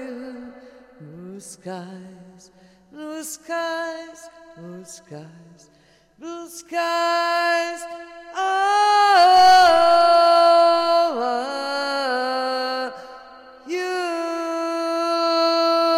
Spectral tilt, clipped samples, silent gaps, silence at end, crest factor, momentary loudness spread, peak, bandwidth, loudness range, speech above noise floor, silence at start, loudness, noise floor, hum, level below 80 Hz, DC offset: -2.5 dB/octave; under 0.1%; none; 0 s; 16 dB; 25 LU; -6 dBFS; 15.5 kHz; 18 LU; 19 dB; 0 s; -18 LUFS; -45 dBFS; none; -62 dBFS; under 0.1%